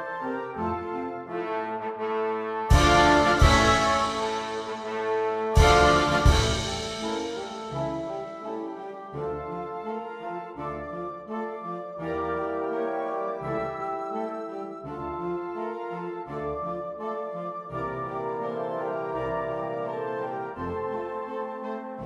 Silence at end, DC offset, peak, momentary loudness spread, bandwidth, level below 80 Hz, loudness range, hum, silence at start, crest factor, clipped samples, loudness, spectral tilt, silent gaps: 0 s; under 0.1%; -4 dBFS; 15 LU; 15 kHz; -34 dBFS; 12 LU; none; 0 s; 22 dB; under 0.1%; -27 LUFS; -5 dB/octave; none